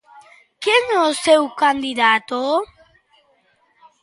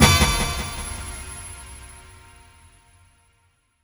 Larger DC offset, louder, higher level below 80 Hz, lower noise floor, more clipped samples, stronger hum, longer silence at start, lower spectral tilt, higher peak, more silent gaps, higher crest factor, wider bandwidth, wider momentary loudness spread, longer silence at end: neither; first, -17 LUFS vs -23 LUFS; second, -62 dBFS vs -32 dBFS; second, -60 dBFS vs -64 dBFS; neither; neither; first, 0.15 s vs 0 s; second, -1.5 dB/octave vs -3.5 dB/octave; about the same, -2 dBFS vs 0 dBFS; neither; second, 18 dB vs 24 dB; second, 11.5 kHz vs over 20 kHz; second, 7 LU vs 25 LU; second, 1.4 s vs 1.85 s